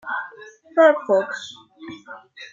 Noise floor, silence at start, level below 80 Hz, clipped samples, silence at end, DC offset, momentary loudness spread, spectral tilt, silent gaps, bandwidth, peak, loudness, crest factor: -44 dBFS; 0.05 s; -74 dBFS; under 0.1%; 0.05 s; under 0.1%; 24 LU; -4 dB/octave; none; 7.6 kHz; -4 dBFS; -19 LUFS; 20 dB